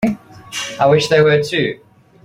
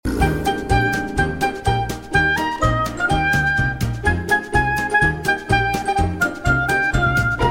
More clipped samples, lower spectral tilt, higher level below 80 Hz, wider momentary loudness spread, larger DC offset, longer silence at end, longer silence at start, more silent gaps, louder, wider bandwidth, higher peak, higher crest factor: neither; about the same, -5 dB/octave vs -5.5 dB/octave; second, -50 dBFS vs -30 dBFS; first, 16 LU vs 4 LU; neither; first, 0.5 s vs 0 s; about the same, 0 s vs 0.05 s; neither; first, -15 LUFS vs -19 LUFS; about the same, 15 kHz vs 16.5 kHz; about the same, -2 dBFS vs -4 dBFS; about the same, 14 dB vs 16 dB